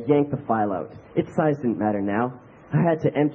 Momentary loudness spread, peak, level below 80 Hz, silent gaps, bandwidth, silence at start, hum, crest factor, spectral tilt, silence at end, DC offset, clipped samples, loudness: 7 LU; -6 dBFS; -60 dBFS; none; 7.2 kHz; 0 s; none; 16 dB; -10 dB/octave; 0 s; under 0.1%; under 0.1%; -24 LUFS